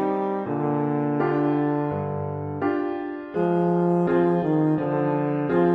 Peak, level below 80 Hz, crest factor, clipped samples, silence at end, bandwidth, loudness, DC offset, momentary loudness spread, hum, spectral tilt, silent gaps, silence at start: -10 dBFS; -56 dBFS; 14 dB; under 0.1%; 0 s; 5 kHz; -24 LUFS; under 0.1%; 7 LU; none; -10.5 dB/octave; none; 0 s